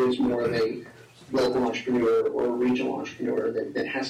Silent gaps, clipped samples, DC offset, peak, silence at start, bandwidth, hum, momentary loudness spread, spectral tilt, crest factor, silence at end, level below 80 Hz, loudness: none; under 0.1%; under 0.1%; -16 dBFS; 0 s; 12.5 kHz; none; 7 LU; -6 dB/octave; 8 dB; 0 s; -60 dBFS; -26 LUFS